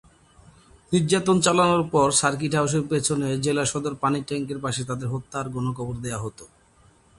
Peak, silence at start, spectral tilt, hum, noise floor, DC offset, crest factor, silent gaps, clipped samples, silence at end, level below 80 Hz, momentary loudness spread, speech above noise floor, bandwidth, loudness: -6 dBFS; 0.9 s; -4.5 dB/octave; none; -57 dBFS; under 0.1%; 18 dB; none; under 0.1%; 0.75 s; -54 dBFS; 11 LU; 34 dB; 11.5 kHz; -23 LUFS